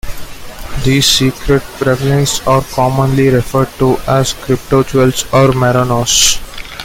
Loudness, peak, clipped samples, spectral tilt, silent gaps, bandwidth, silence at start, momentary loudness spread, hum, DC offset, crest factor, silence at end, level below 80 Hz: -12 LUFS; 0 dBFS; under 0.1%; -4 dB/octave; none; 17 kHz; 0.05 s; 10 LU; none; under 0.1%; 12 dB; 0 s; -28 dBFS